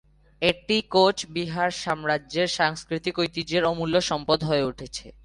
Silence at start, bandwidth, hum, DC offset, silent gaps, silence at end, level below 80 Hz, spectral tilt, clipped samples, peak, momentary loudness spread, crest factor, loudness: 0.4 s; 11.5 kHz; none; under 0.1%; none; 0.15 s; -52 dBFS; -4.5 dB/octave; under 0.1%; -6 dBFS; 8 LU; 18 dB; -24 LUFS